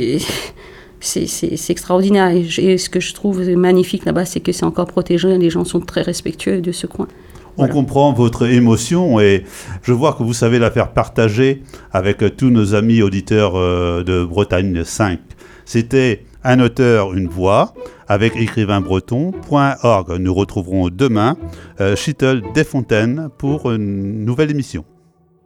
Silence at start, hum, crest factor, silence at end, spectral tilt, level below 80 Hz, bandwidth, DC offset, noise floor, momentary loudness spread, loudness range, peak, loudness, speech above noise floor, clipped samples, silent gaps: 0 s; none; 14 dB; 0.65 s; -6 dB/octave; -40 dBFS; 16.5 kHz; under 0.1%; -53 dBFS; 8 LU; 3 LU; 0 dBFS; -16 LUFS; 38 dB; under 0.1%; none